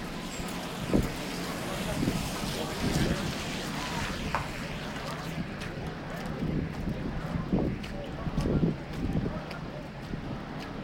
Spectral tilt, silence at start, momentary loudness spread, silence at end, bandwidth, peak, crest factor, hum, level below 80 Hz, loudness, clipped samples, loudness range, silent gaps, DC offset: -5.5 dB/octave; 0 s; 8 LU; 0 s; 17 kHz; -10 dBFS; 22 dB; none; -42 dBFS; -33 LUFS; under 0.1%; 3 LU; none; under 0.1%